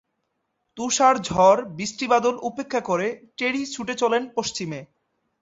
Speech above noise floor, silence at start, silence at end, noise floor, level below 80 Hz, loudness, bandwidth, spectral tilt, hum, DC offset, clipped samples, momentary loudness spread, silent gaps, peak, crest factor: 53 dB; 0.75 s; 0.55 s; -76 dBFS; -58 dBFS; -22 LUFS; 8 kHz; -3.5 dB/octave; none; under 0.1%; under 0.1%; 13 LU; none; -4 dBFS; 18 dB